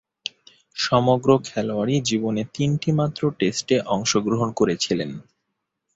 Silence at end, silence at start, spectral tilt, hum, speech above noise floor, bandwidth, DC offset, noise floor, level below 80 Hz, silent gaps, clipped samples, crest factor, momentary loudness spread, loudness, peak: 0.75 s; 0.75 s; -5 dB/octave; none; 57 dB; 8 kHz; under 0.1%; -78 dBFS; -56 dBFS; none; under 0.1%; 20 dB; 14 LU; -22 LUFS; -4 dBFS